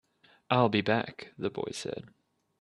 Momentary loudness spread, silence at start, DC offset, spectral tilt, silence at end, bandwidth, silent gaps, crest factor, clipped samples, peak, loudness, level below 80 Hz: 14 LU; 0.5 s; under 0.1%; -5.5 dB/octave; 0.55 s; 12.5 kHz; none; 22 dB; under 0.1%; -10 dBFS; -30 LUFS; -70 dBFS